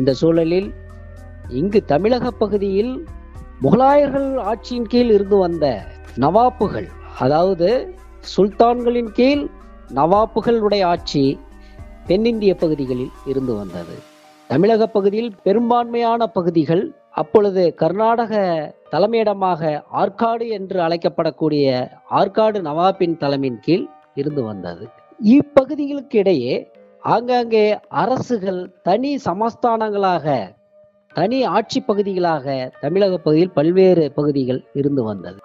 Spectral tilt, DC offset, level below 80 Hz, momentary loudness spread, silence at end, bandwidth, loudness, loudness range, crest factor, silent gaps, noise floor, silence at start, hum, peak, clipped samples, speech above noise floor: -7.5 dB/octave; under 0.1%; -44 dBFS; 11 LU; 0.1 s; 7.8 kHz; -18 LUFS; 3 LU; 18 dB; none; -52 dBFS; 0 s; none; 0 dBFS; under 0.1%; 35 dB